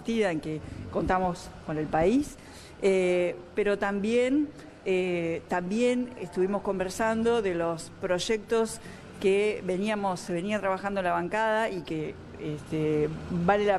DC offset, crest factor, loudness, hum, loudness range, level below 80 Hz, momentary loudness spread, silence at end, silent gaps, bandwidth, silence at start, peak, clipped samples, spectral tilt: under 0.1%; 18 dB; -28 LUFS; none; 2 LU; -52 dBFS; 10 LU; 0 s; none; 13 kHz; 0 s; -10 dBFS; under 0.1%; -5.5 dB/octave